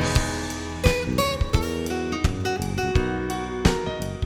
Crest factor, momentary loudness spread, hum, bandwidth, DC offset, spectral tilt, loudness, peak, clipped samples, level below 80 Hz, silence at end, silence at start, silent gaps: 20 dB; 5 LU; none; 20 kHz; under 0.1%; -5 dB/octave; -25 LUFS; -4 dBFS; under 0.1%; -30 dBFS; 0 s; 0 s; none